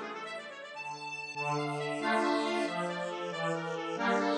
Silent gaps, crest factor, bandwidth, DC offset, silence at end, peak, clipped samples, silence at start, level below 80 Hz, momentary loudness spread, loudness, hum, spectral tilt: none; 16 dB; 11.5 kHz; under 0.1%; 0 s; -16 dBFS; under 0.1%; 0 s; -90 dBFS; 11 LU; -34 LUFS; none; -5 dB/octave